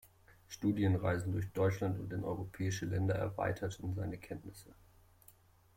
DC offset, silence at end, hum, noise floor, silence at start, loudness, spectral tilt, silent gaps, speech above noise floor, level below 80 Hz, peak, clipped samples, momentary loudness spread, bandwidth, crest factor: under 0.1%; 1.05 s; none; -64 dBFS; 0.5 s; -37 LUFS; -7 dB/octave; none; 28 dB; -60 dBFS; -20 dBFS; under 0.1%; 14 LU; 16 kHz; 18 dB